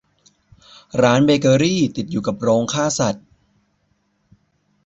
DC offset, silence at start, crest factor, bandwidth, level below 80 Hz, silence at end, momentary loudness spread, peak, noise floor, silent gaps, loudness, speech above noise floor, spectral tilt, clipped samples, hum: under 0.1%; 0.95 s; 18 dB; 8.2 kHz; -54 dBFS; 1.7 s; 9 LU; -2 dBFS; -65 dBFS; none; -18 LUFS; 49 dB; -5 dB/octave; under 0.1%; none